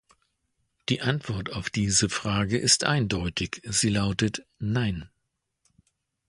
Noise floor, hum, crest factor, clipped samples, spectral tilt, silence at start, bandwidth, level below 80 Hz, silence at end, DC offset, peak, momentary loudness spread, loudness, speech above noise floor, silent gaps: -79 dBFS; none; 22 dB; under 0.1%; -3.5 dB/octave; 0.9 s; 11.5 kHz; -48 dBFS; 1.2 s; under 0.1%; -6 dBFS; 10 LU; -26 LUFS; 53 dB; none